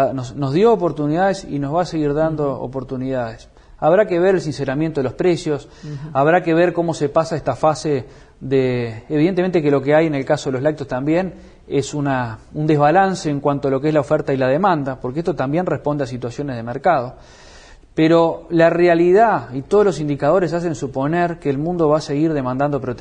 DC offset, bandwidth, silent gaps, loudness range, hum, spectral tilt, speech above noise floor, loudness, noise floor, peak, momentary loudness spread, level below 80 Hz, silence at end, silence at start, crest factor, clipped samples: under 0.1%; 10 kHz; none; 4 LU; none; -7 dB/octave; 25 dB; -18 LUFS; -43 dBFS; -2 dBFS; 10 LU; -46 dBFS; 0 s; 0 s; 16 dB; under 0.1%